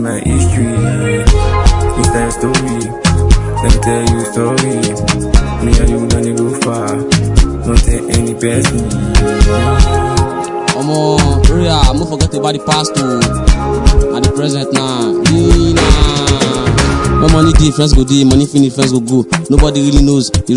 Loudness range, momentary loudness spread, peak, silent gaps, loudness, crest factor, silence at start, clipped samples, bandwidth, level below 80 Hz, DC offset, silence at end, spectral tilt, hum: 3 LU; 5 LU; 0 dBFS; none; -12 LUFS; 10 dB; 0 s; 1%; 11.5 kHz; -14 dBFS; under 0.1%; 0 s; -5.5 dB/octave; none